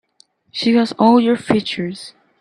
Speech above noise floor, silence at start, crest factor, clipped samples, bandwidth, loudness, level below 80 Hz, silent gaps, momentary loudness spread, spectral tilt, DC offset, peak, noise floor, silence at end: 40 dB; 0.55 s; 16 dB; under 0.1%; 10.5 kHz; -16 LUFS; -58 dBFS; none; 18 LU; -6 dB/octave; under 0.1%; 0 dBFS; -56 dBFS; 0.3 s